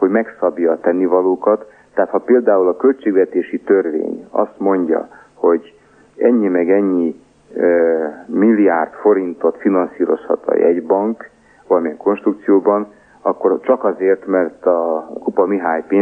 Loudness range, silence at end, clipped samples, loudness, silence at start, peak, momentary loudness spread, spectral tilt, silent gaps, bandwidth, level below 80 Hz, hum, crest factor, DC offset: 2 LU; 0 s; under 0.1%; -16 LUFS; 0 s; -2 dBFS; 7 LU; -9.5 dB/octave; none; 3.5 kHz; -66 dBFS; none; 14 dB; under 0.1%